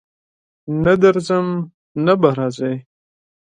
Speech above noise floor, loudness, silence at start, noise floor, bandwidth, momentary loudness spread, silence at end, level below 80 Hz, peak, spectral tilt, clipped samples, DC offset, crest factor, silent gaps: over 74 dB; -17 LUFS; 0.65 s; under -90 dBFS; 9.8 kHz; 14 LU; 0.7 s; -52 dBFS; 0 dBFS; -7.5 dB/octave; under 0.1%; under 0.1%; 18 dB; 1.74-1.95 s